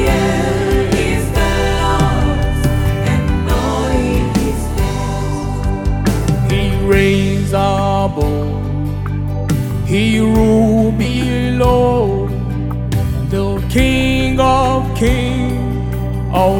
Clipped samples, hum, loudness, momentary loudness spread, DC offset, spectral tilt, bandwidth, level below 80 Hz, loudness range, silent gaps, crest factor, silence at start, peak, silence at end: under 0.1%; none; -15 LUFS; 7 LU; under 0.1%; -6.5 dB/octave; 18.5 kHz; -22 dBFS; 3 LU; none; 12 dB; 0 s; -2 dBFS; 0 s